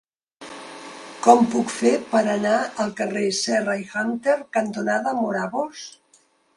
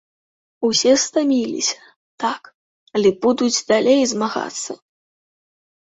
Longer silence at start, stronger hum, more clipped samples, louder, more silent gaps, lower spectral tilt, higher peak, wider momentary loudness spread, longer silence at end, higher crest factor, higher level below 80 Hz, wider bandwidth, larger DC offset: second, 0.4 s vs 0.6 s; neither; neither; second, -22 LUFS vs -18 LUFS; second, none vs 1.96-2.18 s, 2.54-2.87 s; about the same, -4 dB/octave vs -3 dB/octave; first, 0 dBFS vs -4 dBFS; first, 21 LU vs 13 LU; second, 0.65 s vs 1.2 s; about the same, 22 dB vs 18 dB; about the same, -68 dBFS vs -64 dBFS; first, 11.5 kHz vs 8.2 kHz; neither